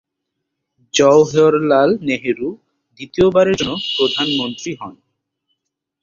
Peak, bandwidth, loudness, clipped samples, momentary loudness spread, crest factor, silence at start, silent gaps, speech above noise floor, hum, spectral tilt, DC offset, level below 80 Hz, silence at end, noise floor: -2 dBFS; 7.6 kHz; -15 LUFS; under 0.1%; 16 LU; 16 dB; 0.95 s; none; 62 dB; none; -4.5 dB/octave; under 0.1%; -52 dBFS; 1.1 s; -77 dBFS